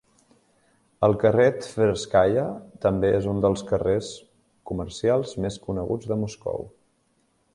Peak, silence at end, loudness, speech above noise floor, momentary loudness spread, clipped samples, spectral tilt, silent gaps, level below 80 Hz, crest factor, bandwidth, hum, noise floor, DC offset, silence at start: -4 dBFS; 0.85 s; -24 LUFS; 44 dB; 12 LU; under 0.1%; -6.5 dB/octave; none; -48 dBFS; 20 dB; 11.5 kHz; none; -67 dBFS; under 0.1%; 1 s